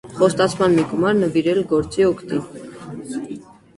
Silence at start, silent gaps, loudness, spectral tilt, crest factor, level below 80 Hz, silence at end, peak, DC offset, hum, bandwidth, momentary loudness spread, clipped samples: 0.05 s; none; -19 LUFS; -6 dB/octave; 16 dB; -50 dBFS; 0.35 s; -2 dBFS; under 0.1%; none; 11.5 kHz; 17 LU; under 0.1%